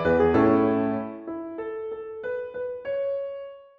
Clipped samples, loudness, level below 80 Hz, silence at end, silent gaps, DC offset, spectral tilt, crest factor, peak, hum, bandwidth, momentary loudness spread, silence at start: under 0.1%; -26 LUFS; -50 dBFS; 0.15 s; none; under 0.1%; -6.5 dB/octave; 16 dB; -8 dBFS; none; 5.8 kHz; 15 LU; 0 s